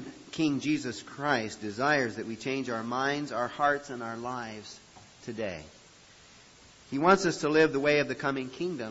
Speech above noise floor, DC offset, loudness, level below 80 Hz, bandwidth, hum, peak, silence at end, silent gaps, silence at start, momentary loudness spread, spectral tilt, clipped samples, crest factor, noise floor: 26 dB; under 0.1%; -29 LUFS; -66 dBFS; 8 kHz; none; -10 dBFS; 0 s; none; 0 s; 16 LU; -5 dB/octave; under 0.1%; 22 dB; -56 dBFS